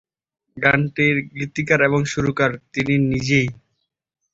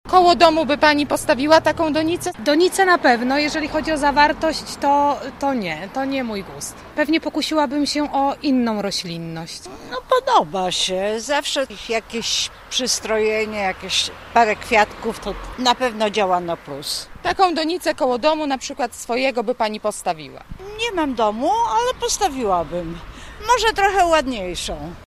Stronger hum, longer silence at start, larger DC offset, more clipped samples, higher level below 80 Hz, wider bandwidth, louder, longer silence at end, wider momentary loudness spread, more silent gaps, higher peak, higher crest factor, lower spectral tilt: neither; first, 0.55 s vs 0.05 s; neither; neither; about the same, -48 dBFS vs -44 dBFS; second, 7.8 kHz vs 15.5 kHz; about the same, -19 LUFS vs -19 LUFS; first, 0.8 s vs 0.05 s; second, 8 LU vs 12 LU; neither; about the same, -2 dBFS vs 0 dBFS; about the same, 18 dB vs 20 dB; first, -6 dB/octave vs -3 dB/octave